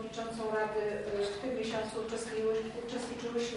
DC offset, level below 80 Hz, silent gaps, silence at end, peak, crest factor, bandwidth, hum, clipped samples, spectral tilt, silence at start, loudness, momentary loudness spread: under 0.1%; -62 dBFS; none; 0 s; -22 dBFS; 14 dB; 11 kHz; none; under 0.1%; -4 dB/octave; 0 s; -36 LUFS; 6 LU